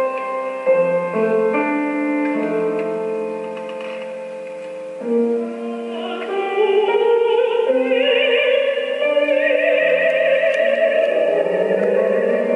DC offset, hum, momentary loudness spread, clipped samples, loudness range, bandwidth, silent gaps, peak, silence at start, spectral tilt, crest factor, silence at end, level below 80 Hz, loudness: under 0.1%; none; 12 LU; under 0.1%; 8 LU; 11 kHz; none; -6 dBFS; 0 s; -5.5 dB/octave; 12 dB; 0 s; -80 dBFS; -18 LUFS